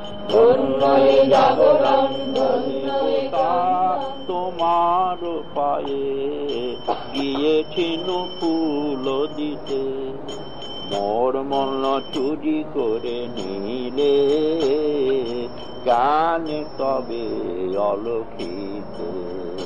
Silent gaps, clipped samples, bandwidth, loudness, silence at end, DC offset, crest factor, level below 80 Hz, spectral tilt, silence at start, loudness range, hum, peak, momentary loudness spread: none; under 0.1%; 9.2 kHz; -21 LUFS; 0 s; 2%; 16 dB; -52 dBFS; -6 dB/octave; 0 s; 7 LU; none; -4 dBFS; 13 LU